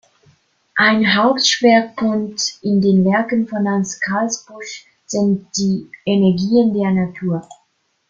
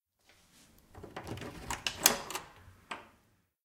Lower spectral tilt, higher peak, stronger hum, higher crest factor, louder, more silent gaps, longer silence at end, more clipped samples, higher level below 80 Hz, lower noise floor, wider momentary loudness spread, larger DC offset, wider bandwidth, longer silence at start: first, -4.5 dB/octave vs -1 dB/octave; about the same, -2 dBFS vs -2 dBFS; neither; second, 16 dB vs 36 dB; first, -16 LUFS vs -33 LUFS; neither; about the same, 0.55 s vs 0.55 s; neither; about the same, -56 dBFS vs -60 dBFS; second, -65 dBFS vs -71 dBFS; second, 11 LU vs 21 LU; neither; second, 7.6 kHz vs 17.5 kHz; second, 0.75 s vs 0.95 s